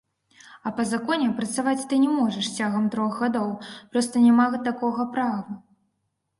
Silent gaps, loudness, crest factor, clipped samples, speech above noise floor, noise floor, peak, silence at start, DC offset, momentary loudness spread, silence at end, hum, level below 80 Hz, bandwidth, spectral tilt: none; -24 LUFS; 16 dB; under 0.1%; 53 dB; -76 dBFS; -8 dBFS; 0.5 s; under 0.1%; 13 LU; 0.8 s; none; -68 dBFS; 11.5 kHz; -4.5 dB/octave